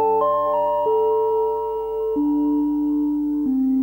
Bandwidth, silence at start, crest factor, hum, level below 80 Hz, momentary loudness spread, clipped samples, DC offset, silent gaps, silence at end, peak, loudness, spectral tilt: 16.5 kHz; 0 s; 12 dB; none; -50 dBFS; 4 LU; under 0.1%; under 0.1%; none; 0 s; -8 dBFS; -21 LUFS; -8.5 dB/octave